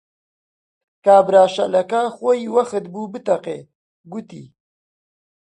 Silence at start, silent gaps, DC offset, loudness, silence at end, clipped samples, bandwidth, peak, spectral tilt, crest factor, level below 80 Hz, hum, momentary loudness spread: 1.05 s; 3.75-4.04 s; under 0.1%; -17 LUFS; 1.15 s; under 0.1%; 10 kHz; -2 dBFS; -5.5 dB/octave; 18 dB; -70 dBFS; none; 20 LU